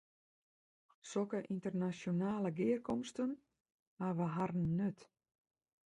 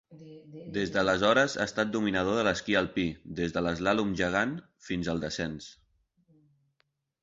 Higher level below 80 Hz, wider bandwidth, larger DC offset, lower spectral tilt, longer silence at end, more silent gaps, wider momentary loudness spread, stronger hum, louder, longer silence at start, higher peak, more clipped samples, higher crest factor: second, -72 dBFS vs -54 dBFS; first, 10.5 kHz vs 7.8 kHz; neither; first, -7.5 dB/octave vs -5 dB/octave; second, 0.9 s vs 1.5 s; first, 3.60-3.64 s, 3.74-3.97 s vs none; second, 7 LU vs 15 LU; neither; second, -39 LUFS vs -29 LUFS; first, 1.05 s vs 0.1 s; second, -24 dBFS vs -12 dBFS; neither; about the same, 16 dB vs 20 dB